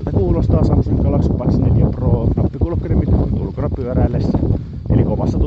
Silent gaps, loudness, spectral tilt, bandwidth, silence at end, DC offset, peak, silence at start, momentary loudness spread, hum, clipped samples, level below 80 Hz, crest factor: none; -17 LUFS; -11 dB/octave; 6.6 kHz; 0 s; under 0.1%; 0 dBFS; 0 s; 5 LU; none; under 0.1%; -22 dBFS; 14 dB